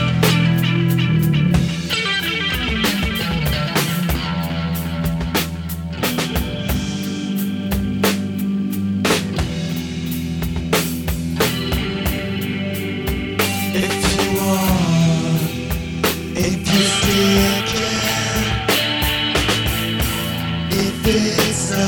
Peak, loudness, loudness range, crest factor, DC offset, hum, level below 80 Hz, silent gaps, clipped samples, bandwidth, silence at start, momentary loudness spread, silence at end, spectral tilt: -2 dBFS; -19 LUFS; 4 LU; 16 dB; under 0.1%; none; -32 dBFS; none; under 0.1%; 19.5 kHz; 0 s; 7 LU; 0 s; -4.5 dB/octave